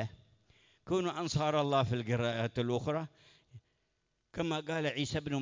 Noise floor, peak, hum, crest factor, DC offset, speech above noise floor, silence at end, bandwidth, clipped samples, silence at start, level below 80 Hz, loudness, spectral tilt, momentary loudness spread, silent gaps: -80 dBFS; -18 dBFS; none; 18 dB; under 0.1%; 47 dB; 0 s; 7.6 kHz; under 0.1%; 0 s; -60 dBFS; -34 LUFS; -6 dB/octave; 8 LU; none